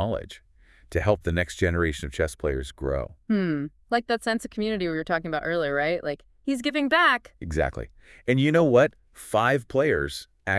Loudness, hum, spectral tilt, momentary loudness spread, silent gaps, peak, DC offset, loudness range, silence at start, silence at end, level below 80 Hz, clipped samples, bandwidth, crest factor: -25 LUFS; none; -6 dB/octave; 12 LU; none; -6 dBFS; under 0.1%; 5 LU; 0 s; 0 s; -44 dBFS; under 0.1%; 12 kHz; 18 dB